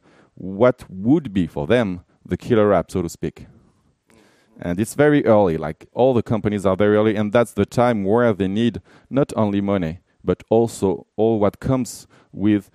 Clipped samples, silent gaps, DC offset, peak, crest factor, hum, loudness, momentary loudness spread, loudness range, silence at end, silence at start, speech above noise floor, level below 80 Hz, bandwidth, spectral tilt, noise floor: under 0.1%; none; under 0.1%; -2 dBFS; 18 dB; none; -20 LUFS; 12 LU; 4 LU; 0.1 s; 0.4 s; 40 dB; -48 dBFS; 14.5 kHz; -7 dB/octave; -59 dBFS